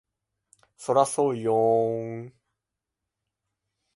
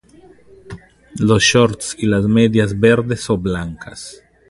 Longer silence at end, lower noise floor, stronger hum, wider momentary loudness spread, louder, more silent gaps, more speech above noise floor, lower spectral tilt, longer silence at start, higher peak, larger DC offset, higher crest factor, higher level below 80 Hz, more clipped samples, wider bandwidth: first, 1.65 s vs 0.35 s; first, -86 dBFS vs -46 dBFS; neither; second, 16 LU vs 19 LU; second, -24 LUFS vs -15 LUFS; neither; first, 62 dB vs 31 dB; about the same, -6 dB/octave vs -5 dB/octave; first, 0.8 s vs 0.65 s; second, -6 dBFS vs 0 dBFS; neither; first, 22 dB vs 16 dB; second, -74 dBFS vs -40 dBFS; neither; about the same, 11.5 kHz vs 11.5 kHz